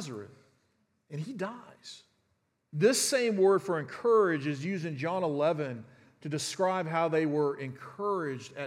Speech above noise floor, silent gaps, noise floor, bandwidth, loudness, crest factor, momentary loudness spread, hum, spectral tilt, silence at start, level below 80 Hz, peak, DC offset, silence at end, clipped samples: 46 dB; none; -76 dBFS; 16 kHz; -30 LUFS; 18 dB; 18 LU; none; -4.5 dB/octave; 0 s; -84 dBFS; -12 dBFS; under 0.1%; 0 s; under 0.1%